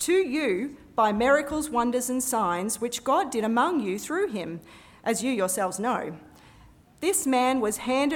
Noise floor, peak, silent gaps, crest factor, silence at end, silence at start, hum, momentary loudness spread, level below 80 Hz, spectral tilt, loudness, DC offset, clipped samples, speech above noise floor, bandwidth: -54 dBFS; -10 dBFS; none; 16 dB; 0 s; 0 s; none; 8 LU; -58 dBFS; -3.5 dB/octave; -26 LUFS; under 0.1%; under 0.1%; 28 dB; 18.5 kHz